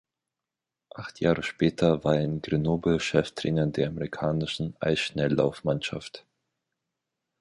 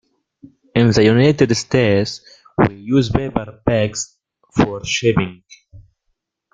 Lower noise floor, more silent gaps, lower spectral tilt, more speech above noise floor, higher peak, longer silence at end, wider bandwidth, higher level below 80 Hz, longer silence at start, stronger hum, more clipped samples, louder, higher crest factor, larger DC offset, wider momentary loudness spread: first, -88 dBFS vs -71 dBFS; neither; about the same, -6.5 dB/octave vs -5.5 dB/octave; first, 62 dB vs 55 dB; second, -8 dBFS vs -2 dBFS; first, 1.2 s vs 0.75 s; first, 11.5 kHz vs 9.4 kHz; second, -52 dBFS vs -42 dBFS; first, 0.95 s vs 0.75 s; neither; neither; second, -27 LUFS vs -17 LUFS; about the same, 20 dB vs 16 dB; neither; about the same, 12 LU vs 13 LU